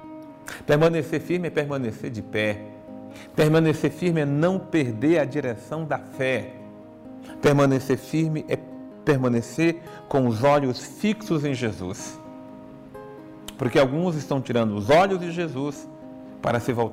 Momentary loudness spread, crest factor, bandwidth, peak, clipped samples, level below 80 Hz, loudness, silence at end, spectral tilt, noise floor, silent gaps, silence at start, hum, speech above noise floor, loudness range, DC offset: 21 LU; 14 dB; 16 kHz; -10 dBFS; under 0.1%; -56 dBFS; -24 LUFS; 0 s; -6.5 dB/octave; -42 dBFS; none; 0 s; none; 20 dB; 3 LU; under 0.1%